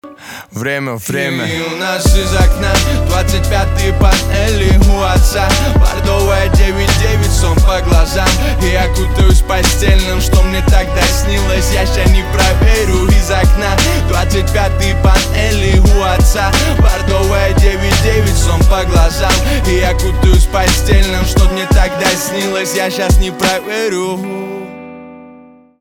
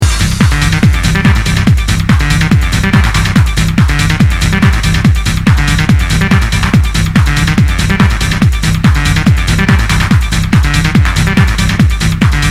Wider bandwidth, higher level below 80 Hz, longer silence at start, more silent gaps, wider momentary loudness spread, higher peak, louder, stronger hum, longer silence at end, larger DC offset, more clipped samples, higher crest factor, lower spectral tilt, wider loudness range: first, 18 kHz vs 15.5 kHz; about the same, -14 dBFS vs -14 dBFS; about the same, 0.05 s vs 0 s; neither; first, 5 LU vs 1 LU; about the same, 0 dBFS vs 0 dBFS; about the same, -12 LUFS vs -10 LUFS; neither; first, 0.5 s vs 0 s; second, under 0.1% vs 0.3%; second, under 0.1% vs 0.2%; about the same, 10 dB vs 8 dB; about the same, -4.5 dB/octave vs -5 dB/octave; about the same, 2 LU vs 0 LU